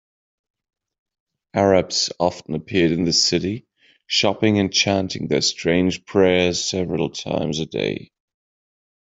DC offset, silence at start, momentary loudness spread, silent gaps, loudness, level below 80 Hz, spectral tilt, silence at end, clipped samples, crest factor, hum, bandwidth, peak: under 0.1%; 1.55 s; 8 LU; none; -20 LUFS; -56 dBFS; -4 dB/octave; 1.1 s; under 0.1%; 18 dB; none; 8.2 kHz; -2 dBFS